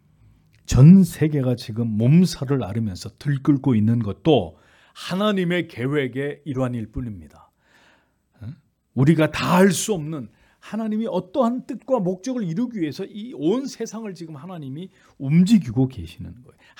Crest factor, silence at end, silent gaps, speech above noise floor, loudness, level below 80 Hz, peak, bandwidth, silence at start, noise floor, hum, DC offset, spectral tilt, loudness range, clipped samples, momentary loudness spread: 20 dB; 0.45 s; none; 41 dB; -21 LUFS; -46 dBFS; -2 dBFS; 18 kHz; 0.7 s; -61 dBFS; none; under 0.1%; -7 dB/octave; 8 LU; under 0.1%; 19 LU